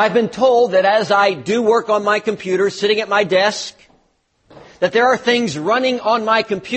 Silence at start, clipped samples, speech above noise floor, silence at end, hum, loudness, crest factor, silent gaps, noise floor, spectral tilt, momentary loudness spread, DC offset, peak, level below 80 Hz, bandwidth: 0 s; under 0.1%; 46 dB; 0 s; none; -16 LUFS; 14 dB; none; -61 dBFS; -4 dB/octave; 5 LU; under 0.1%; -2 dBFS; -60 dBFS; 8.8 kHz